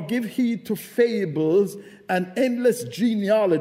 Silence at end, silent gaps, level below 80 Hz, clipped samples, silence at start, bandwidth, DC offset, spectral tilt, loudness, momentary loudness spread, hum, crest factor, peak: 0 s; none; -72 dBFS; under 0.1%; 0 s; 16 kHz; under 0.1%; -6 dB/octave; -23 LUFS; 7 LU; none; 16 dB; -6 dBFS